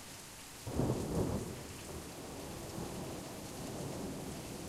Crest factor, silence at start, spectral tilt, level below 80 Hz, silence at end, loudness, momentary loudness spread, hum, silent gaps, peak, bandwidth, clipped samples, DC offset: 22 dB; 0 s; -5 dB/octave; -54 dBFS; 0 s; -42 LUFS; 10 LU; none; none; -20 dBFS; 16 kHz; under 0.1%; under 0.1%